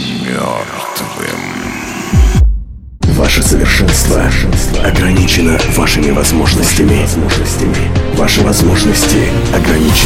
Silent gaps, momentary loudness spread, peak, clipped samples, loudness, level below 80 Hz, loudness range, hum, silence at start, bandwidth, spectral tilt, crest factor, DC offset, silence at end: none; 9 LU; 0 dBFS; under 0.1%; -11 LUFS; -16 dBFS; 3 LU; none; 0 s; 17 kHz; -4.5 dB/octave; 10 dB; under 0.1%; 0 s